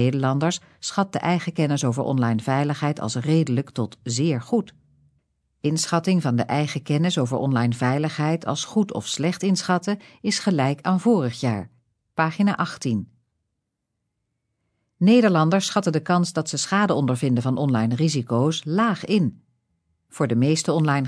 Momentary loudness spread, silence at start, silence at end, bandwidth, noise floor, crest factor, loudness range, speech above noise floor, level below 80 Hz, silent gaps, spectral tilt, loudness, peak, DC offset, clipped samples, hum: 7 LU; 0 s; 0 s; 11 kHz; -79 dBFS; 18 dB; 4 LU; 57 dB; -66 dBFS; none; -5.5 dB/octave; -22 LUFS; -6 dBFS; under 0.1%; under 0.1%; none